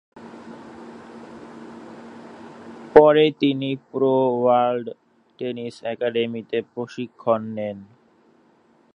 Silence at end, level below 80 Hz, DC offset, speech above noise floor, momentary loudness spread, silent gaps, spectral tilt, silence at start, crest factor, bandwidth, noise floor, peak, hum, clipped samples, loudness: 1.1 s; -62 dBFS; under 0.1%; 37 dB; 25 LU; none; -7.5 dB/octave; 0.15 s; 22 dB; 7.8 kHz; -58 dBFS; 0 dBFS; none; under 0.1%; -21 LUFS